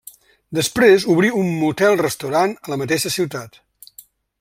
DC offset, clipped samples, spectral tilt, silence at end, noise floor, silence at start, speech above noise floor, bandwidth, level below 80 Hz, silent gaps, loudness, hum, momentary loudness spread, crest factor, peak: under 0.1%; under 0.1%; -4.5 dB/octave; 0.95 s; -48 dBFS; 0.5 s; 30 dB; 16.5 kHz; -56 dBFS; none; -18 LUFS; none; 12 LU; 18 dB; -2 dBFS